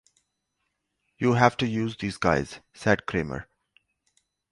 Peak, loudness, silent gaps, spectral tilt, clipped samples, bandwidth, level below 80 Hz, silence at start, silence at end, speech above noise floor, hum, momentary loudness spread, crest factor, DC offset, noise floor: -4 dBFS; -25 LUFS; none; -6 dB/octave; under 0.1%; 11.5 kHz; -52 dBFS; 1.2 s; 1.1 s; 54 dB; 50 Hz at -50 dBFS; 12 LU; 24 dB; under 0.1%; -79 dBFS